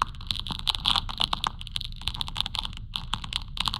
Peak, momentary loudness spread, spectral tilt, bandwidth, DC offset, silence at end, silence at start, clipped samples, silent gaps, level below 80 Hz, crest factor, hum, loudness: -4 dBFS; 9 LU; -2.5 dB/octave; 16.5 kHz; under 0.1%; 0 s; 0 s; under 0.1%; none; -38 dBFS; 26 dB; none; -29 LUFS